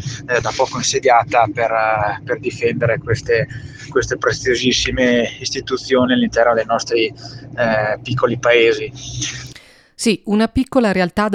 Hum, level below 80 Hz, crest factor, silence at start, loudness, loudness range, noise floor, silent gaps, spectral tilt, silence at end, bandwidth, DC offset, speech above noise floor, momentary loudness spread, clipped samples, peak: none; -42 dBFS; 18 dB; 0 s; -17 LUFS; 2 LU; -43 dBFS; none; -4 dB/octave; 0 s; 13 kHz; under 0.1%; 26 dB; 10 LU; under 0.1%; 0 dBFS